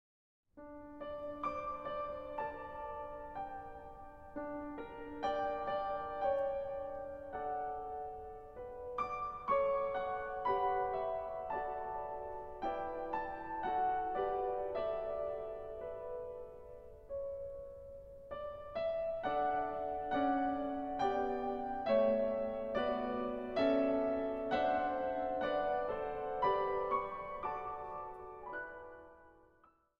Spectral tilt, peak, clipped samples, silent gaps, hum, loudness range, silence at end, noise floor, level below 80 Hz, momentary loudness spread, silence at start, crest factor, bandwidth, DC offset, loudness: -7 dB/octave; -20 dBFS; under 0.1%; none; none; 9 LU; 0.6 s; -69 dBFS; -60 dBFS; 15 LU; 0.55 s; 18 dB; 6.4 kHz; under 0.1%; -38 LUFS